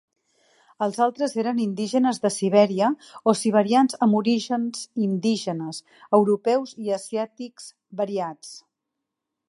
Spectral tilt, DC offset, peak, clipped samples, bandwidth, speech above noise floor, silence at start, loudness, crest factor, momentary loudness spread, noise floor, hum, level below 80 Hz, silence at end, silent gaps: -5.5 dB/octave; under 0.1%; -4 dBFS; under 0.1%; 11.5 kHz; 60 dB; 0.8 s; -23 LUFS; 20 dB; 14 LU; -83 dBFS; none; -76 dBFS; 0.9 s; none